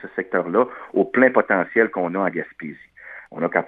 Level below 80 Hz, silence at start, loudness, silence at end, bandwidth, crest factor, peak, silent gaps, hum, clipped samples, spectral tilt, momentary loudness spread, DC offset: -68 dBFS; 0 s; -20 LUFS; 0 s; 4 kHz; 20 dB; 0 dBFS; none; none; under 0.1%; -10 dB/octave; 20 LU; under 0.1%